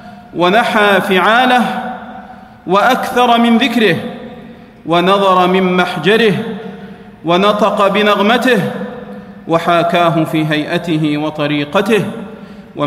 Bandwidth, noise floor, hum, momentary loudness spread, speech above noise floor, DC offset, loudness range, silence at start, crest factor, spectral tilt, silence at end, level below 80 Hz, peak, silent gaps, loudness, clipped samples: 15.5 kHz; -35 dBFS; none; 19 LU; 23 dB; under 0.1%; 2 LU; 0 s; 14 dB; -5.5 dB/octave; 0 s; -52 dBFS; 0 dBFS; none; -12 LUFS; under 0.1%